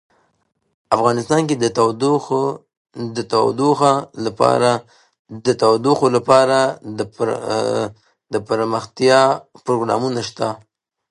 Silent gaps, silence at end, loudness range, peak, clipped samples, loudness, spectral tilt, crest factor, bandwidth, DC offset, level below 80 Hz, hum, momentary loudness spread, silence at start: 2.77-2.85 s, 5.19-5.25 s; 0.55 s; 3 LU; 0 dBFS; under 0.1%; -18 LUFS; -5 dB/octave; 18 dB; 11 kHz; under 0.1%; -60 dBFS; none; 13 LU; 0.9 s